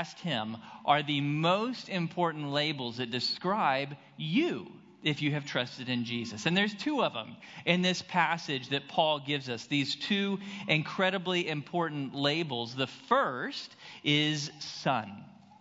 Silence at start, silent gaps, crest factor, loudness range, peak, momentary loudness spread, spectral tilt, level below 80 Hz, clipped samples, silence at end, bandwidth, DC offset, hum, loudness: 0 s; none; 22 dB; 2 LU; -8 dBFS; 9 LU; -5 dB/octave; -78 dBFS; under 0.1%; 0.05 s; 7.8 kHz; under 0.1%; none; -31 LUFS